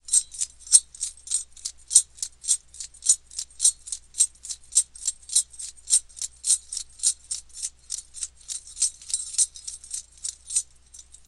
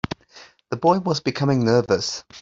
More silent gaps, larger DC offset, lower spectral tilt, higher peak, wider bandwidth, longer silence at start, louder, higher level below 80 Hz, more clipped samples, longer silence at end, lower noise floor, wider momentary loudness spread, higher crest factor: neither; neither; second, 4 dB/octave vs -5.5 dB/octave; first, 0 dBFS vs -4 dBFS; first, 13 kHz vs 7.8 kHz; second, 0.1 s vs 0.35 s; second, -24 LUFS vs -21 LUFS; about the same, -58 dBFS vs -54 dBFS; neither; first, 0.25 s vs 0 s; about the same, -50 dBFS vs -49 dBFS; first, 16 LU vs 13 LU; first, 28 dB vs 18 dB